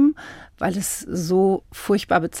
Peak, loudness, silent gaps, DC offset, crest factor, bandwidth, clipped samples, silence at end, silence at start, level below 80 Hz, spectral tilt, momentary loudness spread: -6 dBFS; -22 LUFS; none; under 0.1%; 16 dB; 17 kHz; under 0.1%; 0 s; 0 s; -50 dBFS; -5 dB/octave; 8 LU